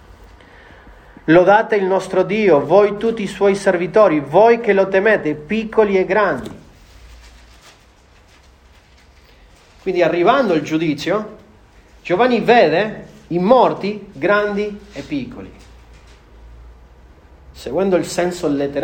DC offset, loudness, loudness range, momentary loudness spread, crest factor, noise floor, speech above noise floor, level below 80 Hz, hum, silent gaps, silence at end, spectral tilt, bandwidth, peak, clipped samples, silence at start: under 0.1%; -16 LUFS; 11 LU; 14 LU; 16 dB; -49 dBFS; 33 dB; -46 dBFS; none; none; 0 s; -6 dB/octave; 15.5 kHz; 0 dBFS; under 0.1%; 0.85 s